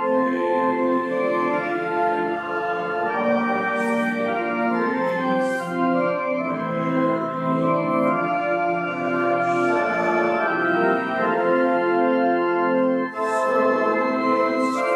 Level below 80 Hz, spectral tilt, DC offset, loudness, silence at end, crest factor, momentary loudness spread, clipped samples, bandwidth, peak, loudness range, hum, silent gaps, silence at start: -70 dBFS; -6.5 dB/octave; under 0.1%; -21 LUFS; 0 s; 14 dB; 4 LU; under 0.1%; 12 kHz; -8 dBFS; 2 LU; none; none; 0 s